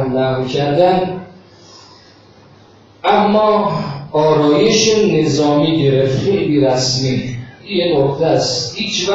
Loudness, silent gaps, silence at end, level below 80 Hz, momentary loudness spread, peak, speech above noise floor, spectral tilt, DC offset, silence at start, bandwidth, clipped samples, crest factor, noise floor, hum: -14 LUFS; none; 0 s; -48 dBFS; 9 LU; 0 dBFS; 31 dB; -5 dB/octave; under 0.1%; 0 s; 8 kHz; under 0.1%; 14 dB; -44 dBFS; none